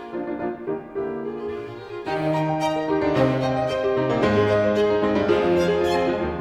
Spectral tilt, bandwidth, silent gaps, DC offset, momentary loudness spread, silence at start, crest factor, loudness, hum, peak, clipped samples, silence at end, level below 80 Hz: -7 dB/octave; 12.5 kHz; none; under 0.1%; 11 LU; 0 s; 16 dB; -22 LUFS; none; -6 dBFS; under 0.1%; 0 s; -48 dBFS